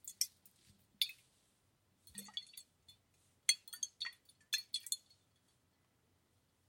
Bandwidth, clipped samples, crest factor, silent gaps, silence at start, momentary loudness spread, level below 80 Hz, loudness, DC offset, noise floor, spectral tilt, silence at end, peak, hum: 16.5 kHz; under 0.1%; 32 dB; none; 0.05 s; 18 LU; -88 dBFS; -40 LUFS; under 0.1%; -77 dBFS; 2.5 dB/octave; 1.7 s; -14 dBFS; none